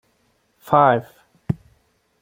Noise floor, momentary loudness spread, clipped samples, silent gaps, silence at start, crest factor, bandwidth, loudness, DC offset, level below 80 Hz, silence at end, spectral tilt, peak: -65 dBFS; 14 LU; under 0.1%; none; 0.65 s; 20 dB; 16.5 kHz; -19 LUFS; under 0.1%; -54 dBFS; 0.65 s; -8 dB/octave; -2 dBFS